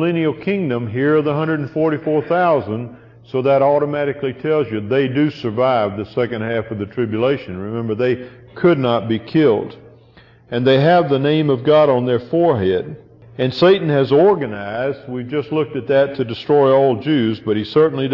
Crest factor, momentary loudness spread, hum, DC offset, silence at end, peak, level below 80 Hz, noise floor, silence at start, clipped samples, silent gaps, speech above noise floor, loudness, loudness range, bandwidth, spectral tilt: 14 dB; 10 LU; none; under 0.1%; 0 s; -2 dBFS; -56 dBFS; -47 dBFS; 0 s; under 0.1%; none; 31 dB; -17 LUFS; 4 LU; 6 kHz; -9 dB/octave